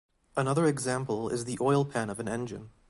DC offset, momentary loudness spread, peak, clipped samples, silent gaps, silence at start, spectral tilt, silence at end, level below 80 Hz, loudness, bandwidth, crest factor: under 0.1%; 9 LU; -14 dBFS; under 0.1%; none; 0.35 s; -6 dB/octave; 0.2 s; -62 dBFS; -30 LUFS; 11.5 kHz; 16 dB